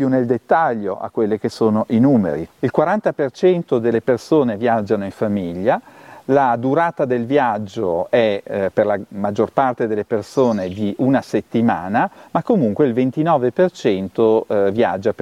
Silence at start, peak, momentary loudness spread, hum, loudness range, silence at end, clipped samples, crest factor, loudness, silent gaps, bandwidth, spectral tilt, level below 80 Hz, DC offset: 0 s; -2 dBFS; 6 LU; none; 2 LU; 0 s; under 0.1%; 16 dB; -18 LUFS; none; 12 kHz; -7.5 dB/octave; -58 dBFS; under 0.1%